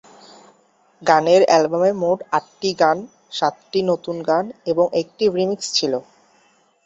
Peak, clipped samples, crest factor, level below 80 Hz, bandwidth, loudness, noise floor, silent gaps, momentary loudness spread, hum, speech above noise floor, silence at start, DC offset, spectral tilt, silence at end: -2 dBFS; under 0.1%; 18 dB; -64 dBFS; 8.2 kHz; -19 LUFS; -58 dBFS; none; 10 LU; none; 40 dB; 1 s; under 0.1%; -4 dB/octave; 0.85 s